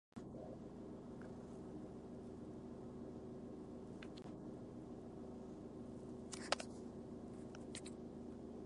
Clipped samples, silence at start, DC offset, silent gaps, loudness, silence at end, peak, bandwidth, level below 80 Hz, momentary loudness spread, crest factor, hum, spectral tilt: under 0.1%; 0.15 s; under 0.1%; none; -52 LUFS; 0 s; -20 dBFS; 11 kHz; -66 dBFS; 3 LU; 32 dB; none; -5 dB/octave